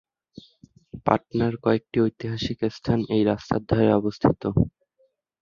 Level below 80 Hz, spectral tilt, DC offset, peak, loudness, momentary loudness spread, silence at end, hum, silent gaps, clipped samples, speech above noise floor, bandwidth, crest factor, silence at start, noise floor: -46 dBFS; -8 dB/octave; under 0.1%; 0 dBFS; -24 LUFS; 7 LU; 0.7 s; none; none; under 0.1%; 44 dB; 7.2 kHz; 24 dB; 0.95 s; -67 dBFS